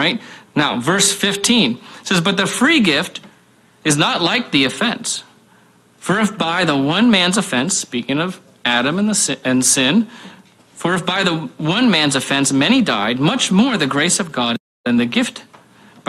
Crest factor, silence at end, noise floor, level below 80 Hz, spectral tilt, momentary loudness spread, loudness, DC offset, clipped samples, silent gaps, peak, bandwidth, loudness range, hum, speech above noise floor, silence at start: 16 dB; 0.65 s; -51 dBFS; -56 dBFS; -3 dB/octave; 9 LU; -16 LUFS; under 0.1%; under 0.1%; 14.60-14.84 s; 0 dBFS; 14.5 kHz; 2 LU; none; 35 dB; 0 s